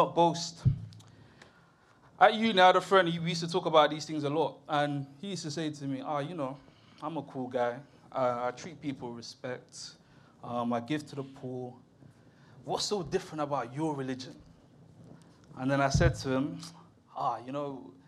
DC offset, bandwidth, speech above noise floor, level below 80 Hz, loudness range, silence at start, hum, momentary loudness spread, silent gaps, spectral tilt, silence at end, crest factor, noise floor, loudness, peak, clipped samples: under 0.1%; 13 kHz; 31 dB; -52 dBFS; 11 LU; 0 s; none; 18 LU; none; -5 dB/octave; 0.15 s; 24 dB; -62 dBFS; -31 LUFS; -8 dBFS; under 0.1%